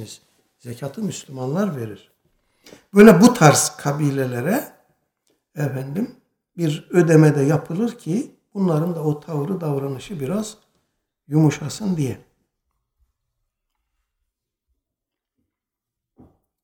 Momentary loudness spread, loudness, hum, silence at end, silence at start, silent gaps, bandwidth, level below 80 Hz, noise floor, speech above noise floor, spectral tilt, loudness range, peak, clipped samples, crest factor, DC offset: 20 LU; -19 LUFS; none; 4.45 s; 0 s; none; 18.5 kHz; -58 dBFS; -85 dBFS; 67 dB; -6 dB/octave; 9 LU; 0 dBFS; under 0.1%; 20 dB; under 0.1%